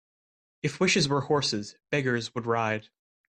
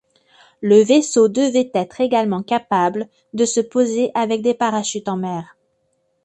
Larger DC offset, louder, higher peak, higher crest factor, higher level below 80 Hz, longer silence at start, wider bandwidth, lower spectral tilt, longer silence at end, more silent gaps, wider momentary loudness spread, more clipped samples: neither; second, -27 LUFS vs -18 LUFS; second, -12 dBFS vs -2 dBFS; about the same, 16 dB vs 18 dB; about the same, -64 dBFS vs -64 dBFS; about the same, 0.65 s vs 0.6 s; about the same, 10.5 kHz vs 11 kHz; about the same, -4 dB/octave vs -4.5 dB/octave; second, 0.5 s vs 0.8 s; neither; about the same, 10 LU vs 11 LU; neither